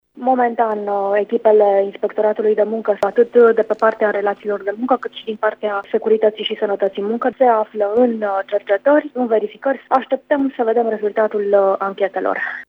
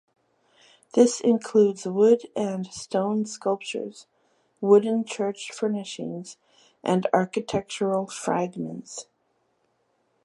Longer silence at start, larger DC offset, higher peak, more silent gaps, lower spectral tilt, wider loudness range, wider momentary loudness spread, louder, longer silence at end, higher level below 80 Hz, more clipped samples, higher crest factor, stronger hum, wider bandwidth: second, 0.15 s vs 0.95 s; neither; first, 0 dBFS vs -4 dBFS; neither; first, -7 dB/octave vs -5.5 dB/octave; about the same, 3 LU vs 5 LU; second, 7 LU vs 14 LU; first, -17 LUFS vs -25 LUFS; second, 0.05 s vs 1.2 s; about the same, -68 dBFS vs -70 dBFS; neither; second, 16 dB vs 22 dB; first, 50 Hz at -70 dBFS vs none; second, 5.8 kHz vs 11.5 kHz